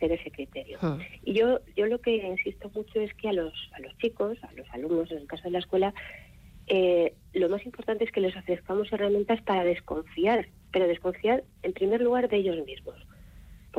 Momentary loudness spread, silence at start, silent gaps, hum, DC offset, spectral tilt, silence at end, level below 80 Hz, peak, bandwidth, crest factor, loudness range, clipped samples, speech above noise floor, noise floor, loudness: 13 LU; 0 s; none; none; under 0.1%; -7 dB/octave; 0 s; -54 dBFS; -14 dBFS; 14.5 kHz; 14 dB; 4 LU; under 0.1%; 21 dB; -49 dBFS; -28 LUFS